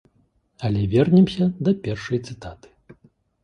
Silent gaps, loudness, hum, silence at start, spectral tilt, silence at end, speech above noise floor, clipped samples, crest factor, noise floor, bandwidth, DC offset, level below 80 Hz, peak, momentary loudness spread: none; -21 LUFS; none; 0.6 s; -8.5 dB/octave; 0.9 s; 44 dB; under 0.1%; 18 dB; -64 dBFS; 9.2 kHz; under 0.1%; -48 dBFS; -4 dBFS; 19 LU